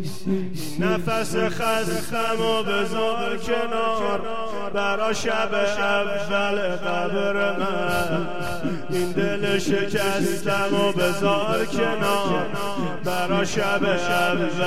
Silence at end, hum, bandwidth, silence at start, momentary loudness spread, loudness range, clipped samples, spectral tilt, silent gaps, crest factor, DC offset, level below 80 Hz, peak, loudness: 0 s; none; 16 kHz; 0 s; 6 LU; 2 LU; under 0.1%; -4.5 dB/octave; none; 16 dB; 4%; -50 dBFS; -6 dBFS; -23 LUFS